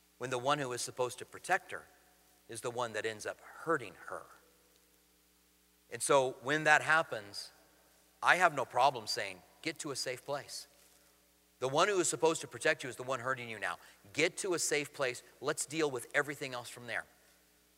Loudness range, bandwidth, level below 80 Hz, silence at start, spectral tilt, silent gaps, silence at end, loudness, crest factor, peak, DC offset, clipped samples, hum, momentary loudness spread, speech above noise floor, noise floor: 10 LU; 16 kHz; -78 dBFS; 0.2 s; -2.5 dB/octave; none; 0.75 s; -34 LUFS; 26 dB; -10 dBFS; under 0.1%; under 0.1%; none; 16 LU; 34 dB; -69 dBFS